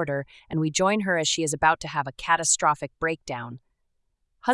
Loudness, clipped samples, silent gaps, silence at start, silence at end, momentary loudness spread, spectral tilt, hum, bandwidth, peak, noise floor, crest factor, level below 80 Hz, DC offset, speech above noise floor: -24 LUFS; under 0.1%; none; 0 s; 0 s; 11 LU; -3 dB/octave; none; 12 kHz; -6 dBFS; -73 dBFS; 20 dB; -56 dBFS; under 0.1%; 48 dB